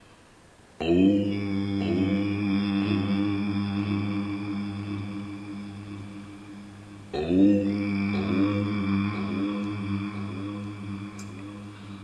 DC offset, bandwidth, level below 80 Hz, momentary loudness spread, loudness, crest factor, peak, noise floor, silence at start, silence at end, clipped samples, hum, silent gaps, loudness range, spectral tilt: under 0.1%; 9.8 kHz; -50 dBFS; 18 LU; -27 LUFS; 18 dB; -10 dBFS; -54 dBFS; 0.8 s; 0 s; under 0.1%; none; none; 7 LU; -8 dB/octave